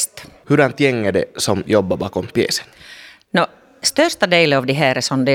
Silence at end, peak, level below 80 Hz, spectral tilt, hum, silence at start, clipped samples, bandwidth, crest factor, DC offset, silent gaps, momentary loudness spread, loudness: 0 s; 0 dBFS; -54 dBFS; -4 dB/octave; none; 0 s; under 0.1%; 19 kHz; 16 dB; under 0.1%; none; 9 LU; -17 LUFS